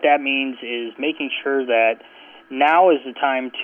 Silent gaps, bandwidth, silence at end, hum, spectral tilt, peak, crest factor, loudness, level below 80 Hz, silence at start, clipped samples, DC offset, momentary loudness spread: none; 3.6 kHz; 0 s; none; -5.5 dB/octave; -4 dBFS; 14 dB; -19 LUFS; -78 dBFS; 0 s; under 0.1%; under 0.1%; 12 LU